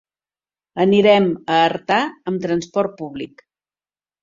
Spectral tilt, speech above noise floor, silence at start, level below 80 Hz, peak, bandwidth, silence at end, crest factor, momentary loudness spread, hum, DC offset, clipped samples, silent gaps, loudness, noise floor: -6 dB/octave; over 72 dB; 0.75 s; -60 dBFS; -2 dBFS; 7.6 kHz; 0.95 s; 18 dB; 17 LU; none; under 0.1%; under 0.1%; none; -17 LUFS; under -90 dBFS